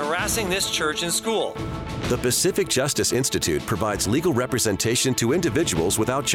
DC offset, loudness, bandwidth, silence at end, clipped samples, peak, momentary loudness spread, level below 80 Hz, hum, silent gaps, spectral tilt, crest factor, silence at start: under 0.1%; -22 LUFS; 17.5 kHz; 0 s; under 0.1%; -8 dBFS; 5 LU; -44 dBFS; none; none; -3.5 dB/octave; 14 dB; 0 s